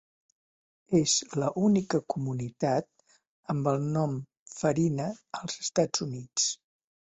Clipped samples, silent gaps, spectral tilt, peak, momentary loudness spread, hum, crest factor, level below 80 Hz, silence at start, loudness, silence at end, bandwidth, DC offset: under 0.1%; 3.27-3.43 s, 4.39-4.46 s; -4.5 dB/octave; -12 dBFS; 11 LU; none; 18 dB; -66 dBFS; 0.9 s; -29 LUFS; 0.45 s; 8.4 kHz; under 0.1%